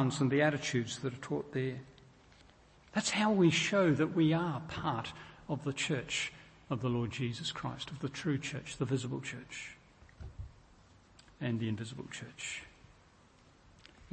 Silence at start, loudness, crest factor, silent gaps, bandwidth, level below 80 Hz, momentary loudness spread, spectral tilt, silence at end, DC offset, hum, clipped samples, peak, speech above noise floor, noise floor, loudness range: 0 s; -34 LUFS; 20 dB; none; 8.8 kHz; -62 dBFS; 16 LU; -5 dB/octave; 0 s; under 0.1%; none; under 0.1%; -16 dBFS; 29 dB; -63 dBFS; 11 LU